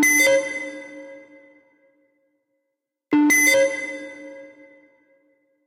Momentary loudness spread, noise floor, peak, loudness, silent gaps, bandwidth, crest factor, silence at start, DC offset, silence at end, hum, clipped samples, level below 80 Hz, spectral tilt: 25 LU; -80 dBFS; -8 dBFS; -18 LUFS; none; 16 kHz; 16 dB; 0 s; under 0.1%; 1.2 s; none; under 0.1%; -74 dBFS; -1 dB/octave